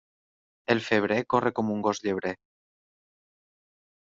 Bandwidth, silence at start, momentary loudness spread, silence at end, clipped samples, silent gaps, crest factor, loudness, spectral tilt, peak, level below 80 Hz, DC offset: 7.6 kHz; 0.7 s; 10 LU; 1.75 s; under 0.1%; none; 24 dB; -27 LUFS; -4 dB/octave; -6 dBFS; -68 dBFS; under 0.1%